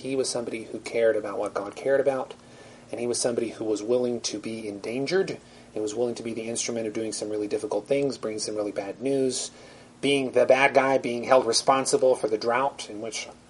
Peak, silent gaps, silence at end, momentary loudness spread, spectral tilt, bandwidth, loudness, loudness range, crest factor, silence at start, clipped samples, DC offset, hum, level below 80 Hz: -4 dBFS; none; 0.15 s; 12 LU; -3.5 dB/octave; 11.5 kHz; -26 LUFS; 7 LU; 22 dB; 0 s; under 0.1%; under 0.1%; none; -66 dBFS